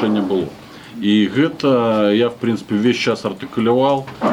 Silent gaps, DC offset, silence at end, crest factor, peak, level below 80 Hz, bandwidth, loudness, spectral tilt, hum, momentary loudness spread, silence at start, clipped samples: none; under 0.1%; 0 s; 12 dB; -4 dBFS; -56 dBFS; 11.5 kHz; -17 LUFS; -6.5 dB/octave; none; 8 LU; 0 s; under 0.1%